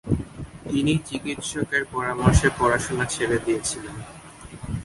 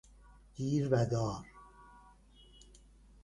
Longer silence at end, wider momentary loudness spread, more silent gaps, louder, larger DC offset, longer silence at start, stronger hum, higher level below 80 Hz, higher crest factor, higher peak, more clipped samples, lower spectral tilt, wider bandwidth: second, 0 s vs 1.25 s; second, 19 LU vs 25 LU; neither; first, -24 LUFS vs -34 LUFS; neither; second, 0.05 s vs 0.55 s; neither; first, -34 dBFS vs -58 dBFS; about the same, 22 dB vs 22 dB; first, -2 dBFS vs -16 dBFS; neither; second, -5 dB/octave vs -7 dB/octave; about the same, 11.5 kHz vs 11 kHz